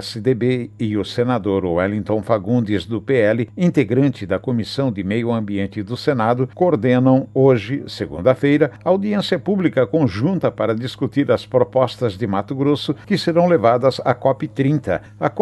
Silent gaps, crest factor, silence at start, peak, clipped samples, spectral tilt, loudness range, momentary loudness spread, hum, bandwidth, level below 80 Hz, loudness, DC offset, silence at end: none; 18 dB; 0 s; 0 dBFS; under 0.1%; -7.5 dB/octave; 2 LU; 7 LU; none; 12.5 kHz; -48 dBFS; -18 LUFS; under 0.1%; 0 s